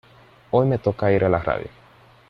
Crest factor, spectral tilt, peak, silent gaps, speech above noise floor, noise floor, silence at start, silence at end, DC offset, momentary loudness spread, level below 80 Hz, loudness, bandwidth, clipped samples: 18 dB; -9.5 dB/octave; -4 dBFS; none; 32 dB; -51 dBFS; 0.55 s; 0.6 s; under 0.1%; 8 LU; -48 dBFS; -21 LUFS; 6 kHz; under 0.1%